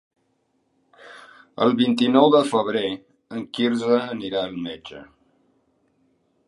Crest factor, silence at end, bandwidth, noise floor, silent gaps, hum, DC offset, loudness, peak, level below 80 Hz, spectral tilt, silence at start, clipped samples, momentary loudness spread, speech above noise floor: 22 dB; 1.45 s; 11.5 kHz; -69 dBFS; none; none; under 0.1%; -21 LUFS; -2 dBFS; -66 dBFS; -5.5 dB/octave; 1.05 s; under 0.1%; 22 LU; 48 dB